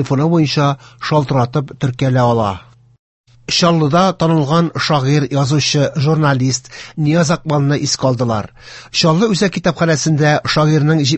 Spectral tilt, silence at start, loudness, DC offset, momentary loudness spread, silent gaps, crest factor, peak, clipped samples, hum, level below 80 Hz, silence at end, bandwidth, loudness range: -5.5 dB/octave; 0 s; -14 LUFS; under 0.1%; 7 LU; 2.99-3.24 s; 14 dB; 0 dBFS; under 0.1%; none; -46 dBFS; 0 s; 8.4 kHz; 2 LU